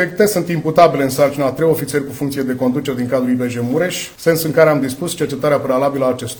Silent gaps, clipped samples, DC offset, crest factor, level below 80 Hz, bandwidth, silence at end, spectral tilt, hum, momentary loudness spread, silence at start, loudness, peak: none; under 0.1%; under 0.1%; 16 dB; -50 dBFS; over 20 kHz; 0 s; -5.5 dB/octave; none; 8 LU; 0 s; -16 LUFS; 0 dBFS